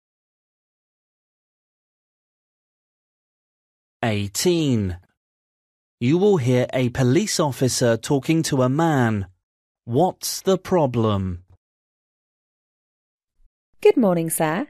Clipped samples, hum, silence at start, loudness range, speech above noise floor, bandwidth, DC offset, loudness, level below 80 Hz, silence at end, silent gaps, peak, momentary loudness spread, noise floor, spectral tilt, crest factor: under 0.1%; none; 4 s; 6 LU; over 70 dB; 14 kHz; under 0.1%; -21 LUFS; -54 dBFS; 0.05 s; 5.17-5.98 s, 9.43-9.75 s, 11.57-13.18 s, 13.46-13.73 s; -4 dBFS; 8 LU; under -90 dBFS; -5.5 dB/octave; 20 dB